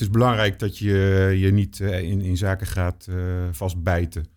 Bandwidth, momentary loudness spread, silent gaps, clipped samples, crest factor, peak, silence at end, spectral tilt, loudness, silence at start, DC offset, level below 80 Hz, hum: 16.5 kHz; 8 LU; none; under 0.1%; 16 dB; -4 dBFS; 0.1 s; -7 dB/octave; -22 LUFS; 0 s; under 0.1%; -38 dBFS; none